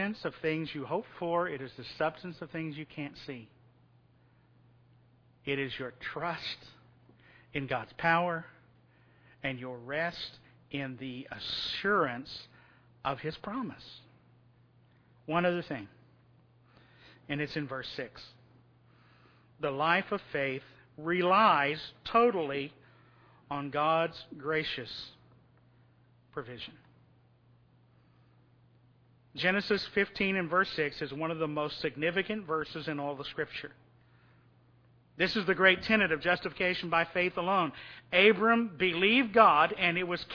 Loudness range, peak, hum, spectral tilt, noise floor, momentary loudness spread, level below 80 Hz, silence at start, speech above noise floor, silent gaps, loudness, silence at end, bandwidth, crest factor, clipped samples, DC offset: 14 LU; -8 dBFS; none; -6.5 dB/octave; -64 dBFS; 18 LU; -66 dBFS; 0 s; 33 dB; none; -31 LUFS; 0 s; 5.4 kHz; 26 dB; under 0.1%; under 0.1%